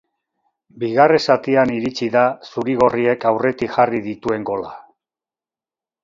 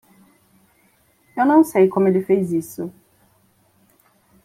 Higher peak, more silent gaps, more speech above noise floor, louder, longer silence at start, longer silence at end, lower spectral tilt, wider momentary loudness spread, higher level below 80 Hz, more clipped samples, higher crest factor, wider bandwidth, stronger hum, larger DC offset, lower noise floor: first, 0 dBFS vs -4 dBFS; neither; first, over 73 dB vs 43 dB; about the same, -18 LUFS vs -18 LUFS; second, 0.75 s vs 1.35 s; second, 1.25 s vs 1.55 s; second, -6 dB/octave vs -8 dB/octave; second, 11 LU vs 18 LU; first, -56 dBFS vs -64 dBFS; neither; about the same, 18 dB vs 18 dB; second, 7.6 kHz vs 15.5 kHz; neither; neither; first, under -90 dBFS vs -59 dBFS